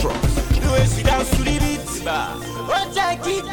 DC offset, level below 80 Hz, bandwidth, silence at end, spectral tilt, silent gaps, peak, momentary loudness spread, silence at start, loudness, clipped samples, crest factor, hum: under 0.1%; -24 dBFS; 19 kHz; 0 s; -4.5 dB/octave; none; -6 dBFS; 7 LU; 0 s; -20 LUFS; under 0.1%; 12 dB; none